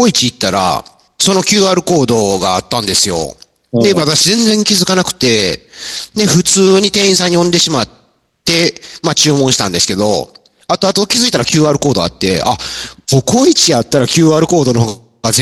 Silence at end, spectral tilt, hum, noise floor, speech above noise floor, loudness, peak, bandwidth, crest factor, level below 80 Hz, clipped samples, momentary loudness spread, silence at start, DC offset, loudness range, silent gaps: 0 s; -3.5 dB/octave; none; -42 dBFS; 31 dB; -11 LUFS; 0 dBFS; 16.5 kHz; 12 dB; -44 dBFS; under 0.1%; 10 LU; 0 s; under 0.1%; 2 LU; none